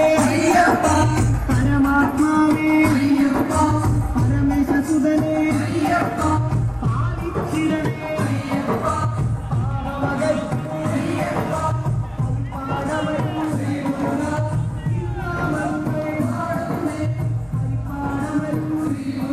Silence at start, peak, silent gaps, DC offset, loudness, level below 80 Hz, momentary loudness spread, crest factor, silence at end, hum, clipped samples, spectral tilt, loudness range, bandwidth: 0 s; -6 dBFS; none; under 0.1%; -20 LUFS; -34 dBFS; 8 LU; 14 dB; 0 s; none; under 0.1%; -7 dB/octave; 6 LU; 15 kHz